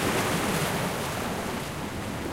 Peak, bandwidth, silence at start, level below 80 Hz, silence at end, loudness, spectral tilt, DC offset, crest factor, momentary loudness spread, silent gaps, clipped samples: -14 dBFS; 16 kHz; 0 s; -46 dBFS; 0 s; -29 LUFS; -4 dB/octave; under 0.1%; 14 dB; 7 LU; none; under 0.1%